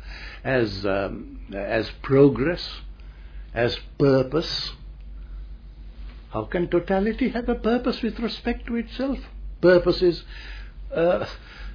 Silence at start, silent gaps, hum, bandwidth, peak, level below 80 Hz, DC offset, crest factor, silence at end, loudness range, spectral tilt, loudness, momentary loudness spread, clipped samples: 0 s; none; none; 5.4 kHz; -4 dBFS; -38 dBFS; under 0.1%; 20 dB; 0 s; 3 LU; -7.5 dB/octave; -24 LUFS; 24 LU; under 0.1%